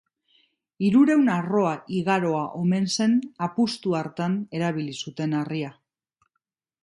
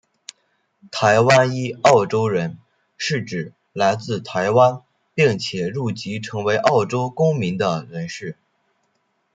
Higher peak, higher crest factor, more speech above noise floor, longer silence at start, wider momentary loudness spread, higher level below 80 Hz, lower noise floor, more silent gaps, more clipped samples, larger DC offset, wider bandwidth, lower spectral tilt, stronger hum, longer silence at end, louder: second, -8 dBFS vs 0 dBFS; about the same, 16 dB vs 20 dB; first, 57 dB vs 50 dB; about the same, 0.8 s vs 0.85 s; second, 11 LU vs 15 LU; about the same, -68 dBFS vs -64 dBFS; first, -80 dBFS vs -68 dBFS; neither; neither; neither; first, 11.5 kHz vs 9.4 kHz; about the same, -6 dB/octave vs -5.5 dB/octave; neither; about the same, 1.1 s vs 1 s; second, -24 LUFS vs -19 LUFS